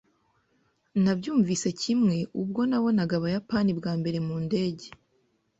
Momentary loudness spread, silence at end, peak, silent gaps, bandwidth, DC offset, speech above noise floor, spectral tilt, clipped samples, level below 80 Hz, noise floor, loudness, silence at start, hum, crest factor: 6 LU; 0.7 s; -14 dBFS; none; 8.2 kHz; under 0.1%; 44 dB; -6 dB/octave; under 0.1%; -62 dBFS; -70 dBFS; -27 LUFS; 0.95 s; none; 14 dB